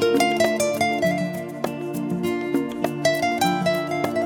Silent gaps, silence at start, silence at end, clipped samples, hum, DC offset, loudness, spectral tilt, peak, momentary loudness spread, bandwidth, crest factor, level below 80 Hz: none; 0 s; 0 s; under 0.1%; none; under 0.1%; -23 LUFS; -4.5 dB/octave; -6 dBFS; 9 LU; 19 kHz; 16 dB; -60 dBFS